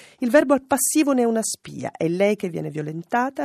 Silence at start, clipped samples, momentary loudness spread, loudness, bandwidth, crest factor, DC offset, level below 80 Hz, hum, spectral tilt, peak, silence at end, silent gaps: 0.2 s; under 0.1%; 11 LU; -21 LUFS; 15.5 kHz; 16 dB; under 0.1%; -66 dBFS; none; -4.5 dB/octave; -4 dBFS; 0 s; none